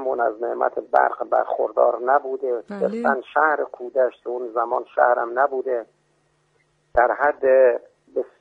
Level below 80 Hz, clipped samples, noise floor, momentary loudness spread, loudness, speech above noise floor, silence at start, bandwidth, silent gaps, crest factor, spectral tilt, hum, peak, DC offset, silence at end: -56 dBFS; under 0.1%; -65 dBFS; 9 LU; -21 LUFS; 45 dB; 0 s; 4.8 kHz; none; 18 dB; -7.5 dB/octave; none; -2 dBFS; under 0.1%; 0.15 s